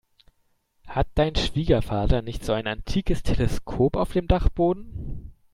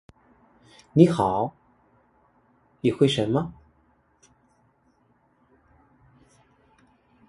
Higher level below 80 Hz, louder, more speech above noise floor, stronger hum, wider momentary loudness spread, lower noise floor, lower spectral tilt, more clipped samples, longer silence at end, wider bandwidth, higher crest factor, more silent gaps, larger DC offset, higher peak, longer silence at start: first, -30 dBFS vs -58 dBFS; about the same, -25 LUFS vs -23 LUFS; about the same, 45 dB vs 44 dB; neither; about the same, 9 LU vs 10 LU; about the same, -68 dBFS vs -65 dBFS; about the same, -6.5 dB/octave vs -7 dB/octave; neither; second, 0.25 s vs 3.8 s; first, 13 kHz vs 11.5 kHz; second, 18 dB vs 26 dB; neither; neither; second, -6 dBFS vs -2 dBFS; about the same, 0.85 s vs 0.95 s